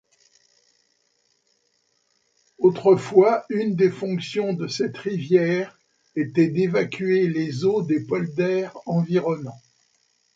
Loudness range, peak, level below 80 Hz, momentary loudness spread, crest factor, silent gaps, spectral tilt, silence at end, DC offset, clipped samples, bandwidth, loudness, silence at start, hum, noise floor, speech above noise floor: 3 LU; -4 dBFS; -68 dBFS; 10 LU; 20 dB; none; -7 dB/octave; 0.8 s; under 0.1%; under 0.1%; 7.8 kHz; -22 LUFS; 2.6 s; none; -68 dBFS; 47 dB